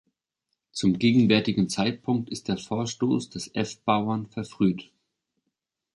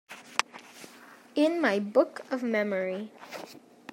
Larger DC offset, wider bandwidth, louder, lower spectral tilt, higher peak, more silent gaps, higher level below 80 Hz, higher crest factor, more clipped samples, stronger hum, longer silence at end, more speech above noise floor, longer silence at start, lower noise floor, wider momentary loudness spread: neither; second, 11.5 kHz vs 16 kHz; first, -25 LUFS vs -29 LUFS; about the same, -5.5 dB/octave vs -4.5 dB/octave; second, -6 dBFS vs -2 dBFS; neither; first, -60 dBFS vs -86 dBFS; second, 20 dB vs 30 dB; neither; neither; first, 1.15 s vs 0.35 s; first, 57 dB vs 24 dB; first, 0.75 s vs 0.1 s; first, -82 dBFS vs -52 dBFS; second, 10 LU vs 22 LU